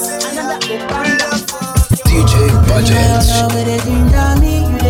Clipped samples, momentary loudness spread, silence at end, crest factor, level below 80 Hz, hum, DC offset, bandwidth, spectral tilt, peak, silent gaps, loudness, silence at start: under 0.1%; 8 LU; 0 s; 12 dB; -16 dBFS; none; under 0.1%; 17.5 kHz; -5 dB/octave; 0 dBFS; none; -13 LUFS; 0 s